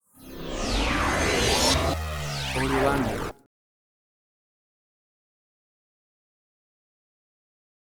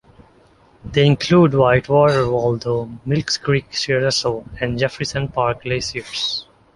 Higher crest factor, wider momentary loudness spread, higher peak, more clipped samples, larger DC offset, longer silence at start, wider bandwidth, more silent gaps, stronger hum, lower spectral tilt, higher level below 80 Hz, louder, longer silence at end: about the same, 20 dB vs 18 dB; first, 14 LU vs 10 LU; second, -8 dBFS vs -2 dBFS; neither; neither; second, 0.2 s vs 0.85 s; first, over 20 kHz vs 11.5 kHz; neither; neither; second, -3.5 dB/octave vs -5.5 dB/octave; first, -38 dBFS vs -44 dBFS; second, -25 LUFS vs -18 LUFS; first, 4.65 s vs 0.35 s